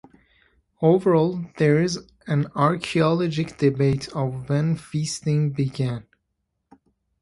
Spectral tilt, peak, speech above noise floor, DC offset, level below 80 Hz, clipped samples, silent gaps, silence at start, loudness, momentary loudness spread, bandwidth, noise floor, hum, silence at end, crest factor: -6.5 dB/octave; -4 dBFS; 55 dB; under 0.1%; -56 dBFS; under 0.1%; none; 0.8 s; -23 LUFS; 8 LU; 11.5 kHz; -76 dBFS; none; 1.2 s; 20 dB